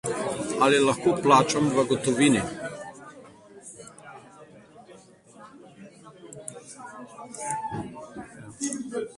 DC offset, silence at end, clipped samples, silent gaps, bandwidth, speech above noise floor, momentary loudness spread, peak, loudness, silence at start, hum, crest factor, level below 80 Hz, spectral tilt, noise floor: under 0.1%; 0.05 s; under 0.1%; none; 11.5 kHz; 30 dB; 25 LU; -4 dBFS; -24 LUFS; 0.05 s; none; 24 dB; -62 dBFS; -4.5 dB/octave; -51 dBFS